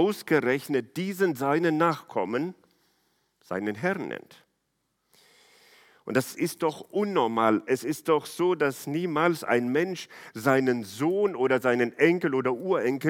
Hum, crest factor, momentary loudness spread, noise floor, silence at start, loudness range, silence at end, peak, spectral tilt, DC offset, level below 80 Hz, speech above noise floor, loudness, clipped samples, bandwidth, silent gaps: none; 20 dB; 8 LU; -77 dBFS; 0 s; 9 LU; 0 s; -6 dBFS; -6 dB/octave; under 0.1%; -76 dBFS; 51 dB; -26 LUFS; under 0.1%; 17.5 kHz; none